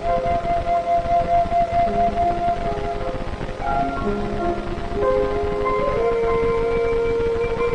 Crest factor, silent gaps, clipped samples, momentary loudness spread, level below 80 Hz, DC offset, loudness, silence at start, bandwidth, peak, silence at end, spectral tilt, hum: 12 dB; none; under 0.1%; 7 LU; -30 dBFS; under 0.1%; -21 LUFS; 0 s; 10 kHz; -8 dBFS; 0 s; -7 dB/octave; none